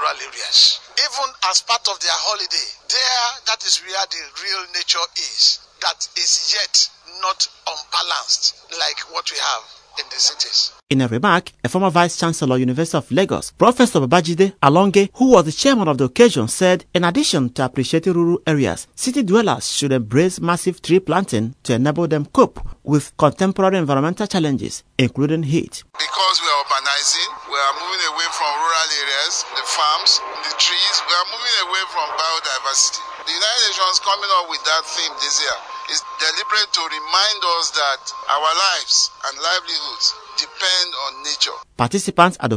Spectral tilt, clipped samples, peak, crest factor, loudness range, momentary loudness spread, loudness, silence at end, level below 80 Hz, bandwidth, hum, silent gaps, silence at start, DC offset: -3 dB/octave; under 0.1%; 0 dBFS; 18 dB; 3 LU; 8 LU; -17 LUFS; 0 s; -50 dBFS; 11 kHz; none; 10.83-10.87 s; 0 s; under 0.1%